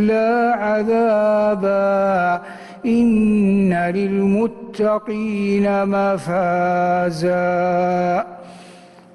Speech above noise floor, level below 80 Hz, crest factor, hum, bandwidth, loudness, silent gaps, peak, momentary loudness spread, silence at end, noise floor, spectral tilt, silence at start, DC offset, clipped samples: 26 dB; -52 dBFS; 10 dB; none; 11.5 kHz; -18 LUFS; none; -8 dBFS; 6 LU; 0.4 s; -43 dBFS; -8 dB/octave; 0 s; under 0.1%; under 0.1%